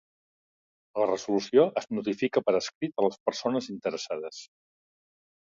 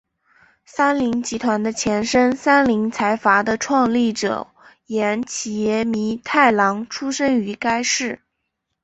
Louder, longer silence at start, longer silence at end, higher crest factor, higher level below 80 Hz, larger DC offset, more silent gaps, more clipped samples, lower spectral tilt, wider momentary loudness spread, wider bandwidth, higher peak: second, -28 LUFS vs -19 LUFS; first, 0.95 s vs 0.75 s; first, 0.95 s vs 0.7 s; about the same, 20 dB vs 18 dB; second, -74 dBFS vs -54 dBFS; neither; first, 2.75-2.81 s, 3.20-3.26 s vs none; neither; first, -5 dB/octave vs -3.5 dB/octave; about the same, 12 LU vs 10 LU; about the same, 7.6 kHz vs 8.2 kHz; second, -10 dBFS vs -2 dBFS